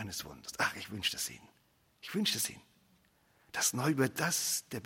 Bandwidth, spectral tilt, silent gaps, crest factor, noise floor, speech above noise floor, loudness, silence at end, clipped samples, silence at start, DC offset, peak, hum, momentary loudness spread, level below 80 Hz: 16.5 kHz; -2.5 dB/octave; none; 20 dB; -69 dBFS; 34 dB; -34 LUFS; 0 s; under 0.1%; 0 s; under 0.1%; -16 dBFS; none; 11 LU; -72 dBFS